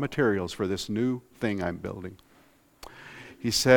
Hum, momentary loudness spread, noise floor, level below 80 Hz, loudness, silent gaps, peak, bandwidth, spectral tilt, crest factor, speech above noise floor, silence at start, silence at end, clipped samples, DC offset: none; 19 LU; -60 dBFS; -56 dBFS; -29 LUFS; none; -4 dBFS; 18.5 kHz; -4.5 dB/octave; 24 dB; 34 dB; 0 s; 0 s; under 0.1%; under 0.1%